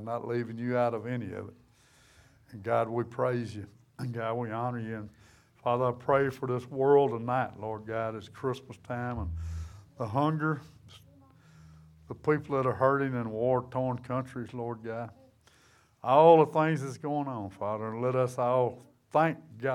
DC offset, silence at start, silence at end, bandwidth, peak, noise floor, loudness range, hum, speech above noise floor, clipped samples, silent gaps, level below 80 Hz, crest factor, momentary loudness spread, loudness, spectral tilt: under 0.1%; 0 s; 0 s; 12.5 kHz; -8 dBFS; -63 dBFS; 8 LU; none; 34 dB; under 0.1%; none; -56 dBFS; 22 dB; 15 LU; -30 LUFS; -8 dB/octave